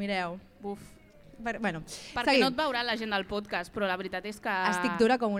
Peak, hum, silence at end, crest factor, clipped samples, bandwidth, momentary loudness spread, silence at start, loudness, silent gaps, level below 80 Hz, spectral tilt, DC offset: -10 dBFS; none; 0 s; 20 dB; under 0.1%; 15.5 kHz; 15 LU; 0 s; -30 LUFS; none; -58 dBFS; -4.5 dB/octave; under 0.1%